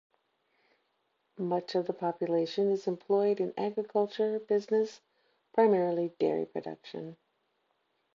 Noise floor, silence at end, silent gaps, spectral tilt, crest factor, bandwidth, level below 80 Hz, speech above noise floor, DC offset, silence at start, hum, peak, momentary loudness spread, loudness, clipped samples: -77 dBFS; 1 s; none; -7 dB/octave; 18 dB; 7.4 kHz; -86 dBFS; 47 dB; under 0.1%; 1.4 s; none; -14 dBFS; 12 LU; -31 LUFS; under 0.1%